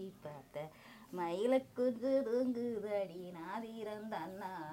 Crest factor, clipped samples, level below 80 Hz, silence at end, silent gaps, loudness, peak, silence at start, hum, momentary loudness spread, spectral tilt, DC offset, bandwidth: 16 dB; under 0.1%; -76 dBFS; 0 s; none; -39 LUFS; -22 dBFS; 0 s; none; 14 LU; -6.5 dB/octave; under 0.1%; 16 kHz